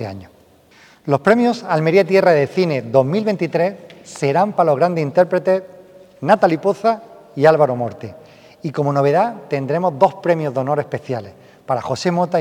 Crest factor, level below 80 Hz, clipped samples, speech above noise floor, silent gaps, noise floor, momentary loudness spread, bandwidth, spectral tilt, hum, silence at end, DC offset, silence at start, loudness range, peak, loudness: 18 dB; -62 dBFS; under 0.1%; 32 dB; none; -49 dBFS; 13 LU; 13.5 kHz; -7 dB/octave; none; 0 s; under 0.1%; 0 s; 3 LU; 0 dBFS; -17 LUFS